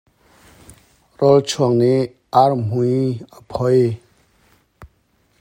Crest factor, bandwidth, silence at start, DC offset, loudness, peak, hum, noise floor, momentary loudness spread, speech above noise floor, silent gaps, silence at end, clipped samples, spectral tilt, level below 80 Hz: 18 dB; 15.5 kHz; 1.2 s; under 0.1%; -17 LUFS; 0 dBFS; none; -61 dBFS; 9 LU; 45 dB; none; 0.55 s; under 0.1%; -7 dB/octave; -54 dBFS